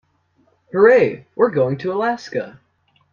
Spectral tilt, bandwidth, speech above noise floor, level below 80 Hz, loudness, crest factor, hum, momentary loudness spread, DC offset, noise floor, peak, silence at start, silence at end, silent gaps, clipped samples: -7 dB/octave; 7 kHz; 44 dB; -62 dBFS; -18 LUFS; 18 dB; none; 15 LU; under 0.1%; -61 dBFS; 0 dBFS; 0.75 s; 0.65 s; none; under 0.1%